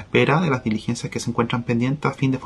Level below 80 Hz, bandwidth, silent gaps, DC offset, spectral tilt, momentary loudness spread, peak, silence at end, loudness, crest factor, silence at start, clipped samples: -52 dBFS; 12 kHz; none; under 0.1%; -6 dB/octave; 7 LU; -2 dBFS; 0 s; -22 LUFS; 18 dB; 0 s; under 0.1%